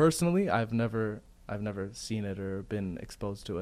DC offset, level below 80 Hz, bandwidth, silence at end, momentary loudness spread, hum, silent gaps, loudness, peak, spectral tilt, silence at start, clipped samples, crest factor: under 0.1%; -54 dBFS; 15.5 kHz; 0 s; 11 LU; none; none; -33 LUFS; -14 dBFS; -6 dB/octave; 0 s; under 0.1%; 18 dB